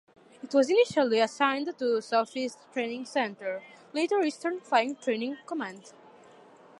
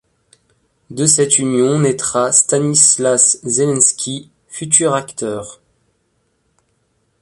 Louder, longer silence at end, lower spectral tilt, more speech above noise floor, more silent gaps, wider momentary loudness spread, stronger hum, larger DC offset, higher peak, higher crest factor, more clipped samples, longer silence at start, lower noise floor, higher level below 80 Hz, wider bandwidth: second, -28 LUFS vs -13 LUFS; second, 0.9 s vs 1.7 s; about the same, -3.5 dB/octave vs -3.5 dB/octave; second, 26 dB vs 49 dB; neither; second, 12 LU vs 18 LU; neither; neither; second, -10 dBFS vs 0 dBFS; about the same, 20 dB vs 16 dB; neither; second, 0.45 s vs 0.9 s; second, -54 dBFS vs -64 dBFS; second, -80 dBFS vs -58 dBFS; about the same, 11.5 kHz vs 12 kHz